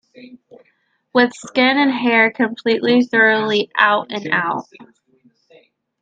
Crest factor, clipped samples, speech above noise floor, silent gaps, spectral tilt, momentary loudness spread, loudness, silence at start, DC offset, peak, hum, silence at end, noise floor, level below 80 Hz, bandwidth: 18 dB; under 0.1%; 46 dB; none; -4.5 dB/octave; 7 LU; -16 LUFS; 0.2 s; under 0.1%; 0 dBFS; none; 1.2 s; -63 dBFS; -70 dBFS; 9 kHz